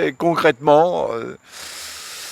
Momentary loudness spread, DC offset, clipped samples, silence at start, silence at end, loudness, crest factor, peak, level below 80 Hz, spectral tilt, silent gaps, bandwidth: 18 LU; under 0.1%; under 0.1%; 0 s; 0 s; -17 LUFS; 20 dB; 0 dBFS; -60 dBFS; -4.5 dB/octave; none; 17.5 kHz